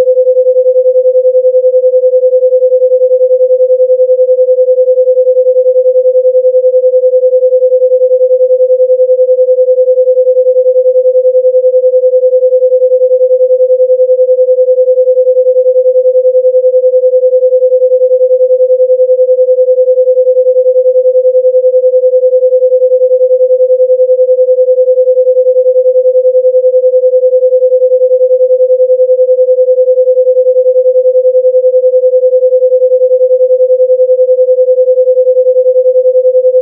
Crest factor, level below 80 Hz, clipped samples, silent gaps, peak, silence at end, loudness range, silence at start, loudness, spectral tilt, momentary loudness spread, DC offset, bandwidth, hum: 6 dB; -88 dBFS; under 0.1%; none; 0 dBFS; 0 s; 0 LU; 0 s; -7 LUFS; -9.5 dB/octave; 0 LU; under 0.1%; 0.6 kHz; none